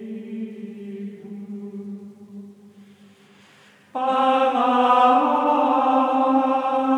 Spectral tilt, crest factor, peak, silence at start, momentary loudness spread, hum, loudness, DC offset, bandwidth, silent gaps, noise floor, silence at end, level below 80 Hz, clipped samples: -6 dB/octave; 16 dB; -6 dBFS; 0 s; 21 LU; none; -19 LUFS; under 0.1%; 10 kHz; none; -52 dBFS; 0 s; under -90 dBFS; under 0.1%